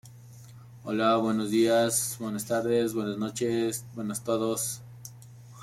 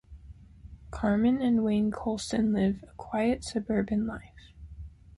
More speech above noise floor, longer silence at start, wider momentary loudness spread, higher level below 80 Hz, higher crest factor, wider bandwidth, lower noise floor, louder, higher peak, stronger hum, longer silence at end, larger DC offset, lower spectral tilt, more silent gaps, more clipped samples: about the same, 21 dB vs 22 dB; about the same, 0.05 s vs 0.1 s; second, 13 LU vs 19 LU; second, -66 dBFS vs -48 dBFS; about the same, 16 dB vs 16 dB; first, 16 kHz vs 11.5 kHz; about the same, -48 dBFS vs -50 dBFS; about the same, -28 LUFS vs -28 LUFS; about the same, -12 dBFS vs -14 dBFS; neither; second, 0 s vs 0.3 s; neither; second, -4 dB/octave vs -6.5 dB/octave; neither; neither